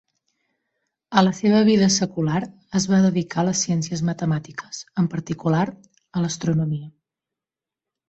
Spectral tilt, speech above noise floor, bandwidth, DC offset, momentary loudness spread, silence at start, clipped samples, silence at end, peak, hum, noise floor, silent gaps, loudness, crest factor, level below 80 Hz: -5.5 dB/octave; 68 dB; 8.2 kHz; under 0.1%; 10 LU; 1.1 s; under 0.1%; 1.2 s; -2 dBFS; none; -89 dBFS; none; -21 LUFS; 20 dB; -58 dBFS